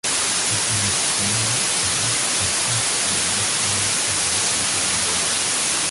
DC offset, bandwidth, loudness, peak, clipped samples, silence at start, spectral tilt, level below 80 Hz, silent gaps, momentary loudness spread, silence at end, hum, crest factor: under 0.1%; 12 kHz; -18 LUFS; -8 dBFS; under 0.1%; 0.05 s; -0.5 dB/octave; -48 dBFS; none; 0 LU; 0 s; none; 14 dB